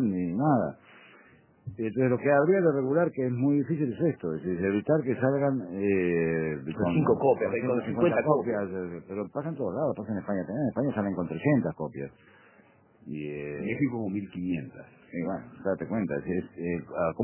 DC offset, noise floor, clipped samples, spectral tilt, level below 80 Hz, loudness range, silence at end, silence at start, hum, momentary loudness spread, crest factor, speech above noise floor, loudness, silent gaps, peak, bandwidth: under 0.1%; -59 dBFS; under 0.1%; -12 dB/octave; -58 dBFS; 7 LU; 0 s; 0 s; none; 11 LU; 20 dB; 32 dB; -28 LUFS; none; -8 dBFS; 3.2 kHz